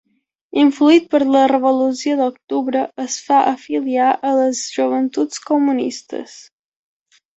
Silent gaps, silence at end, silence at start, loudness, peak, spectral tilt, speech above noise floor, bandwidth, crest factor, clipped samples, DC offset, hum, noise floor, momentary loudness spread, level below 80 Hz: 2.44-2.48 s; 0.95 s; 0.55 s; -17 LUFS; -2 dBFS; -3 dB/octave; 24 dB; 8.2 kHz; 16 dB; under 0.1%; under 0.1%; none; -41 dBFS; 11 LU; -66 dBFS